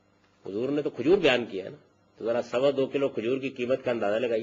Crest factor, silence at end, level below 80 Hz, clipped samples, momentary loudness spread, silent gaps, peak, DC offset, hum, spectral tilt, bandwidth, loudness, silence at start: 20 dB; 0 s; -62 dBFS; under 0.1%; 14 LU; none; -8 dBFS; under 0.1%; none; -6 dB/octave; 7.6 kHz; -27 LUFS; 0.45 s